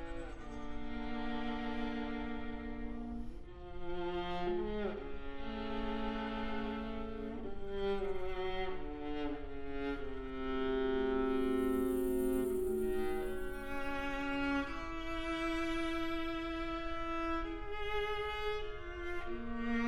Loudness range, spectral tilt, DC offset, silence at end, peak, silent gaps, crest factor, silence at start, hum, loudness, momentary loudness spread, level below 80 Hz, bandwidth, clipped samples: 6 LU; -6 dB/octave; under 0.1%; 0 s; -24 dBFS; none; 14 dB; 0 s; none; -39 LUFS; 10 LU; -46 dBFS; 19.5 kHz; under 0.1%